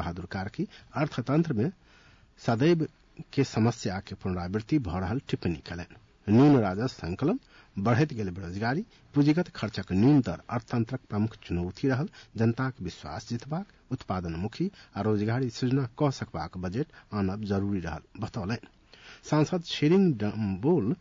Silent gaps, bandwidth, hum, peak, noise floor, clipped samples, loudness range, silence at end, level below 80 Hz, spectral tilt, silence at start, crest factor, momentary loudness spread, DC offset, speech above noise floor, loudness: none; 7.6 kHz; none; -12 dBFS; -57 dBFS; under 0.1%; 5 LU; 0.05 s; -56 dBFS; -7.5 dB/octave; 0 s; 16 dB; 12 LU; under 0.1%; 30 dB; -29 LUFS